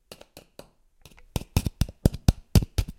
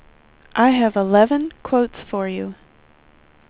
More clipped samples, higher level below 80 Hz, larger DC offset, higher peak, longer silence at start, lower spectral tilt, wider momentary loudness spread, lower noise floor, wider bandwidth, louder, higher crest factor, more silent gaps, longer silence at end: neither; first, -32 dBFS vs -54 dBFS; neither; about the same, -2 dBFS vs -2 dBFS; first, 1.35 s vs 0.55 s; second, -6 dB/octave vs -10 dB/octave; first, 23 LU vs 11 LU; first, -56 dBFS vs -52 dBFS; first, 17 kHz vs 4 kHz; second, -27 LUFS vs -19 LUFS; first, 26 dB vs 18 dB; neither; second, 0.05 s vs 0.95 s